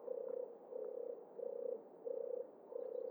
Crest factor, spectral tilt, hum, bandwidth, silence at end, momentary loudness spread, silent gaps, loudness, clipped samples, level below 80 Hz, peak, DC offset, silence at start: 14 dB; -8.5 dB/octave; none; over 20 kHz; 0 s; 5 LU; none; -47 LUFS; under 0.1%; under -90 dBFS; -32 dBFS; under 0.1%; 0 s